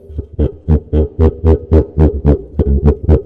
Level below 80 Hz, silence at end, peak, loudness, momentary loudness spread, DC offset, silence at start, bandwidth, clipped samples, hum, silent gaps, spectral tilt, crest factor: -16 dBFS; 0 s; 0 dBFS; -14 LUFS; 7 LU; under 0.1%; 0.1 s; 3.4 kHz; under 0.1%; none; none; -11.5 dB/octave; 12 dB